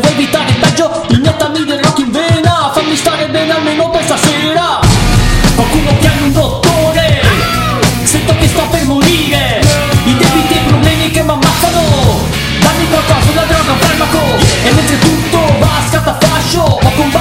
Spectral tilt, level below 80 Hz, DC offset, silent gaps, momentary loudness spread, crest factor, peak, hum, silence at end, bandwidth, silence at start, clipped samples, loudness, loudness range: -4.5 dB/octave; -22 dBFS; under 0.1%; none; 3 LU; 10 dB; 0 dBFS; none; 0 s; 16.5 kHz; 0 s; under 0.1%; -9 LUFS; 1 LU